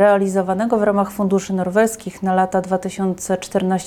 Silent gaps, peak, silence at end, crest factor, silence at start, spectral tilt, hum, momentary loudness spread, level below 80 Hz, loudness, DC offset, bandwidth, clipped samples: none; -4 dBFS; 0 s; 14 dB; 0 s; -6 dB/octave; none; 6 LU; -52 dBFS; -19 LUFS; under 0.1%; 15 kHz; under 0.1%